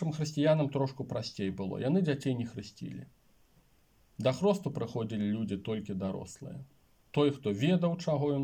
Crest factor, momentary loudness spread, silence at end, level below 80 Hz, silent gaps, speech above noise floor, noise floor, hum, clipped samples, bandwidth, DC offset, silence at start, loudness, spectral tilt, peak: 16 dB; 16 LU; 0 s; -68 dBFS; none; 35 dB; -67 dBFS; none; under 0.1%; 15.5 kHz; under 0.1%; 0 s; -32 LUFS; -7 dB/octave; -16 dBFS